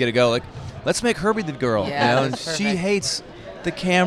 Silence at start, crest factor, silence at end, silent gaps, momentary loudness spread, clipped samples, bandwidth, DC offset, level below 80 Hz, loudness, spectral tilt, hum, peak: 0 s; 18 dB; 0 s; none; 10 LU; under 0.1%; 14.5 kHz; under 0.1%; -48 dBFS; -22 LUFS; -4.5 dB/octave; none; -4 dBFS